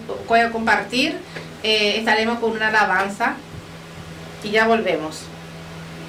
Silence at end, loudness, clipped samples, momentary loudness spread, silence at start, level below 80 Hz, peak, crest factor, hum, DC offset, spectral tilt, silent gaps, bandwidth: 0 s; -19 LUFS; under 0.1%; 19 LU; 0 s; -52 dBFS; -6 dBFS; 16 dB; none; under 0.1%; -3.5 dB/octave; none; 16 kHz